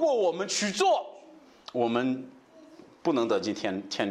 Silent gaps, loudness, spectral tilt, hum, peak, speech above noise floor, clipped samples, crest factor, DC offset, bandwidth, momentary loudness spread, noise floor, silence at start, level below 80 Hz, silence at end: none; -28 LUFS; -3.5 dB/octave; none; -12 dBFS; 26 dB; under 0.1%; 18 dB; under 0.1%; 12.5 kHz; 11 LU; -53 dBFS; 0 s; -76 dBFS; 0 s